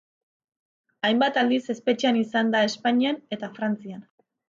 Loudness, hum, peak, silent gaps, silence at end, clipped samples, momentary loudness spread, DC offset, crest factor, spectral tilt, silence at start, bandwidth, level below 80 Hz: -24 LUFS; none; -10 dBFS; none; 0.5 s; under 0.1%; 11 LU; under 0.1%; 16 dB; -4.5 dB/octave; 1.05 s; 7.6 kHz; -74 dBFS